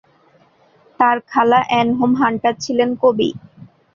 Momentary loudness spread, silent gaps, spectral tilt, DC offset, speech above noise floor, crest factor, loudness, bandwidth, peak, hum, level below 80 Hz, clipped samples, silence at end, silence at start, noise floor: 6 LU; none; -5 dB/octave; under 0.1%; 38 dB; 16 dB; -16 LUFS; 7.2 kHz; 0 dBFS; none; -58 dBFS; under 0.1%; 0.3 s; 1 s; -54 dBFS